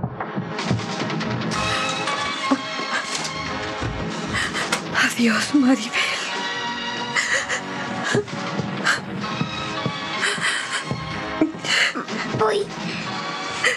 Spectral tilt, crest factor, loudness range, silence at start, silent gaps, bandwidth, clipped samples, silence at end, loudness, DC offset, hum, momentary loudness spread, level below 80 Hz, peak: -3.5 dB/octave; 20 dB; 3 LU; 0 s; none; 13.5 kHz; under 0.1%; 0 s; -23 LUFS; under 0.1%; none; 8 LU; -50 dBFS; -4 dBFS